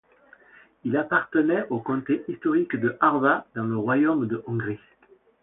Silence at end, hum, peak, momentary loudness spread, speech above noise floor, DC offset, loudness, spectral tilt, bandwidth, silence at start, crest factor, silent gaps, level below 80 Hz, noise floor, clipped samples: 0.65 s; none; -6 dBFS; 8 LU; 31 dB; under 0.1%; -24 LUFS; -11.5 dB/octave; 3.9 kHz; 0.85 s; 18 dB; none; -66 dBFS; -55 dBFS; under 0.1%